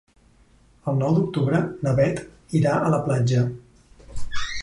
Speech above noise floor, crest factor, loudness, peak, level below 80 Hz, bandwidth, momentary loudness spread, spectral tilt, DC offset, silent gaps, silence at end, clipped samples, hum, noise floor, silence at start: 35 dB; 16 dB; -23 LUFS; -8 dBFS; -44 dBFS; 11 kHz; 13 LU; -7 dB/octave; under 0.1%; none; 0 s; under 0.1%; none; -56 dBFS; 0.85 s